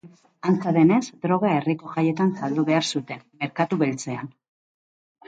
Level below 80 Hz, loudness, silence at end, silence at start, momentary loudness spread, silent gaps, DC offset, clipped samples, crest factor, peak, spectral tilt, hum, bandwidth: -68 dBFS; -23 LUFS; 1 s; 0.05 s; 13 LU; none; under 0.1%; under 0.1%; 16 dB; -6 dBFS; -6 dB/octave; none; 9.2 kHz